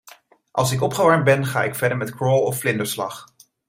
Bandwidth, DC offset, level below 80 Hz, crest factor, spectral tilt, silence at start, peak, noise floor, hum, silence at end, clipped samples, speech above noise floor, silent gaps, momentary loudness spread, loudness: 16.5 kHz; under 0.1%; -56 dBFS; 18 dB; -5 dB/octave; 0.05 s; -2 dBFS; -49 dBFS; none; 0.45 s; under 0.1%; 30 dB; none; 11 LU; -20 LUFS